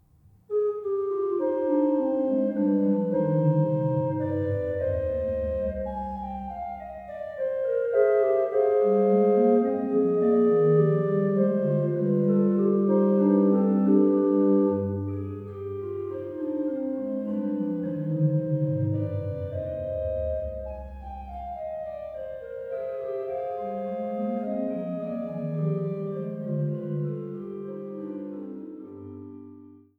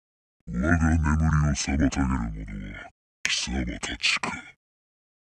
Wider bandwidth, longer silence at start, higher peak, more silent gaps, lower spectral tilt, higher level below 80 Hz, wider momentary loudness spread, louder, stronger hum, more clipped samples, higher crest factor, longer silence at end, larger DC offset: second, 3.7 kHz vs 10.5 kHz; about the same, 0.5 s vs 0.45 s; second, -8 dBFS vs -2 dBFS; second, none vs 2.91-3.24 s; first, -12 dB/octave vs -4.5 dB/octave; second, -50 dBFS vs -34 dBFS; about the same, 15 LU vs 15 LU; about the same, -26 LUFS vs -25 LUFS; neither; neither; second, 16 dB vs 24 dB; second, 0.25 s vs 0.75 s; neither